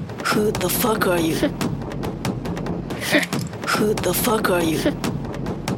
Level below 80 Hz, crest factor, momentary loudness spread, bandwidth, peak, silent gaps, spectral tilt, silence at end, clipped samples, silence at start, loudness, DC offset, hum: -40 dBFS; 18 dB; 8 LU; 18.5 kHz; -4 dBFS; none; -4.5 dB/octave; 0 s; under 0.1%; 0 s; -22 LUFS; under 0.1%; none